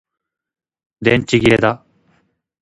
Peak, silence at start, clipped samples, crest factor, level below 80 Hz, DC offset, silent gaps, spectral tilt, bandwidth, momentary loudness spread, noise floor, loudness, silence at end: 0 dBFS; 1 s; under 0.1%; 18 dB; -44 dBFS; under 0.1%; none; -6 dB/octave; 11.5 kHz; 7 LU; -61 dBFS; -15 LUFS; 0.85 s